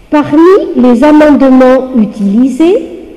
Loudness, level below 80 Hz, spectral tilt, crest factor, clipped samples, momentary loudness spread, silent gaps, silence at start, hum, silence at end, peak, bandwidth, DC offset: -6 LUFS; -36 dBFS; -7 dB/octave; 6 dB; under 0.1%; 6 LU; none; 0.1 s; none; 0.05 s; 0 dBFS; 11 kHz; under 0.1%